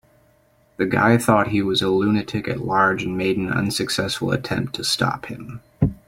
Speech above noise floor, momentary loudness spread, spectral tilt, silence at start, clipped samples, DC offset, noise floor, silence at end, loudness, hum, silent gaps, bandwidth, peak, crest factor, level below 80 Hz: 38 dB; 9 LU; -5 dB/octave; 0.8 s; under 0.1%; under 0.1%; -58 dBFS; 0.1 s; -21 LUFS; none; none; 16.5 kHz; 0 dBFS; 20 dB; -46 dBFS